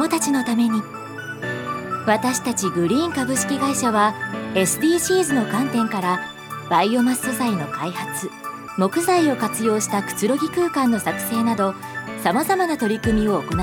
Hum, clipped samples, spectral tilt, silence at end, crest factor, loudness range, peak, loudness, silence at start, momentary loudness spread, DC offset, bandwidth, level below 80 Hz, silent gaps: none; under 0.1%; -4 dB/octave; 0 s; 18 dB; 2 LU; -4 dBFS; -21 LUFS; 0 s; 10 LU; under 0.1%; 18.5 kHz; -46 dBFS; none